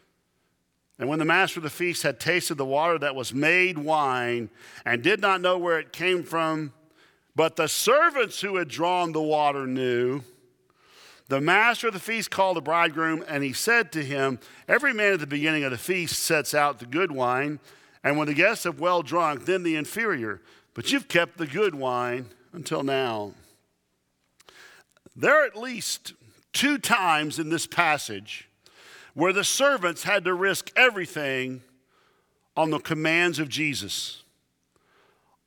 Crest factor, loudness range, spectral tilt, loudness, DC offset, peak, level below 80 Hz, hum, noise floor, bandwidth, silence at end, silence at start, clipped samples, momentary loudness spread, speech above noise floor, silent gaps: 24 dB; 4 LU; -3.5 dB/octave; -24 LUFS; under 0.1%; -2 dBFS; -72 dBFS; none; -73 dBFS; 20 kHz; 1.3 s; 1 s; under 0.1%; 11 LU; 49 dB; none